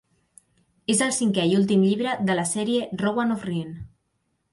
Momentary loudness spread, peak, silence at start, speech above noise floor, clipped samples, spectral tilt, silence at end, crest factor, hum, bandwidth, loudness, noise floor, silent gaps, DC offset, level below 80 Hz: 11 LU; -10 dBFS; 0.9 s; 51 dB; under 0.1%; -4.5 dB/octave; 0.65 s; 14 dB; none; 11.5 kHz; -23 LUFS; -73 dBFS; none; under 0.1%; -58 dBFS